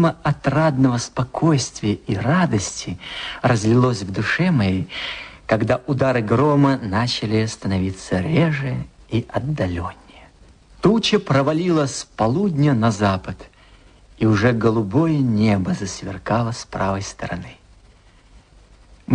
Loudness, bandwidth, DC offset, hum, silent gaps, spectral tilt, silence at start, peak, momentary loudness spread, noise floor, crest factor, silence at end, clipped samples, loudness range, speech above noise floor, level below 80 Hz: -20 LUFS; 10 kHz; under 0.1%; none; none; -6 dB/octave; 0 s; -2 dBFS; 11 LU; -50 dBFS; 18 dB; 0 s; under 0.1%; 4 LU; 31 dB; -46 dBFS